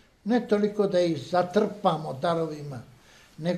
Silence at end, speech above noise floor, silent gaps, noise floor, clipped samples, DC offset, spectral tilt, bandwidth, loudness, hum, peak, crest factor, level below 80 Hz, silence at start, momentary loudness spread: 0 s; 22 dB; none; -48 dBFS; under 0.1%; under 0.1%; -7 dB/octave; 13.5 kHz; -26 LUFS; none; -8 dBFS; 18 dB; -64 dBFS; 0.25 s; 10 LU